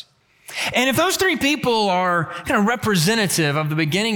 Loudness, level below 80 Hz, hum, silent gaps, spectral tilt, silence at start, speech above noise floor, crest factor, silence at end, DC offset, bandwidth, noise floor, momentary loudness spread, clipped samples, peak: -19 LUFS; -54 dBFS; none; none; -4 dB/octave; 0.5 s; 27 dB; 14 dB; 0 s; under 0.1%; 19.5 kHz; -46 dBFS; 4 LU; under 0.1%; -6 dBFS